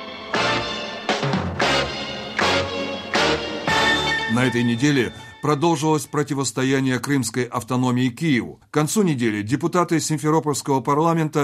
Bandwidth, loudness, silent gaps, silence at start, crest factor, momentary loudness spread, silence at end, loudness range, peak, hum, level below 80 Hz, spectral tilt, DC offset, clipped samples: 15 kHz; -21 LUFS; none; 0 s; 18 dB; 6 LU; 0 s; 2 LU; -4 dBFS; none; -50 dBFS; -4.5 dB/octave; under 0.1%; under 0.1%